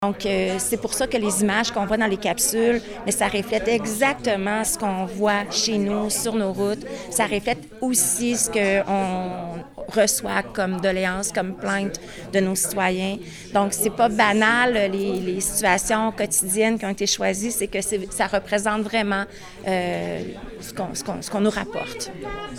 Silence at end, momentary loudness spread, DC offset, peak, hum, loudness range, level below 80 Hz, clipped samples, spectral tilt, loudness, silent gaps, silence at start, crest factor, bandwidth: 0 s; 10 LU; under 0.1%; -4 dBFS; none; 4 LU; -48 dBFS; under 0.1%; -3 dB/octave; -22 LUFS; none; 0 s; 18 dB; 18 kHz